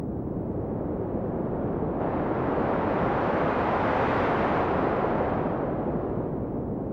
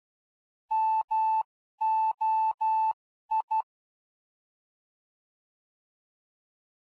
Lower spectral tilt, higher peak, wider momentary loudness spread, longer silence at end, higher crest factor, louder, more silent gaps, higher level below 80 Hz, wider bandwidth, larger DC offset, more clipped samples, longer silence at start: first, -9.5 dB/octave vs -0.5 dB/octave; first, -14 dBFS vs -22 dBFS; about the same, 7 LU vs 6 LU; second, 0 s vs 3.4 s; about the same, 14 dB vs 10 dB; about the same, -27 LUFS vs -28 LUFS; second, none vs 1.04-1.08 s, 1.45-1.78 s, 2.54-2.58 s, 2.93-3.29 s, 3.43-3.48 s; first, -44 dBFS vs -90 dBFS; first, 7.4 kHz vs 4.7 kHz; neither; neither; second, 0 s vs 0.7 s